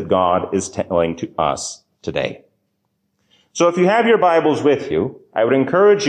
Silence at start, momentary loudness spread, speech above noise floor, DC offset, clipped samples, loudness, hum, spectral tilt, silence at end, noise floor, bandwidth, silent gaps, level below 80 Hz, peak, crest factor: 0 s; 12 LU; 54 dB; under 0.1%; under 0.1%; -17 LUFS; none; -5 dB/octave; 0 s; -70 dBFS; 9.8 kHz; none; -48 dBFS; -4 dBFS; 14 dB